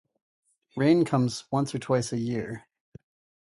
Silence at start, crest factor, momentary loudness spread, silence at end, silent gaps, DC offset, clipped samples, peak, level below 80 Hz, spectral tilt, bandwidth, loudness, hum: 0.75 s; 18 dB; 15 LU; 0.85 s; none; under 0.1%; under 0.1%; -10 dBFS; -64 dBFS; -6.5 dB/octave; 11.5 kHz; -26 LUFS; none